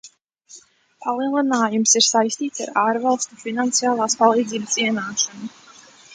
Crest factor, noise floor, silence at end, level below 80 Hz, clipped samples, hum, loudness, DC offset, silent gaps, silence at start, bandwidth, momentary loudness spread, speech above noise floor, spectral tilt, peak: 20 dB; -49 dBFS; 0 s; -72 dBFS; under 0.1%; none; -19 LUFS; under 0.1%; 0.21-0.25 s; 0.05 s; 10 kHz; 11 LU; 29 dB; -2 dB/octave; 0 dBFS